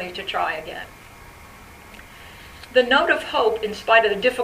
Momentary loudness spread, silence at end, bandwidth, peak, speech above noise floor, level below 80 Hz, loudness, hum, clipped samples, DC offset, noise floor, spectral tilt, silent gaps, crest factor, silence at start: 25 LU; 0 s; 15.5 kHz; -2 dBFS; 23 dB; -50 dBFS; -20 LUFS; none; under 0.1%; under 0.1%; -44 dBFS; -3.5 dB/octave; none; 22 dB; 0 s